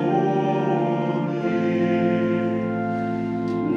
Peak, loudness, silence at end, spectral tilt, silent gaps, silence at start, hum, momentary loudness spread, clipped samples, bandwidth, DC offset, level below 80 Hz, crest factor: -10 dBFS; -23 LUFS; 0 s; -9 dB/octave; none; 0 s; none; 4 LU; under 0.1%; 7 kHz; under 0.1%; -60 dBFS; 12 dB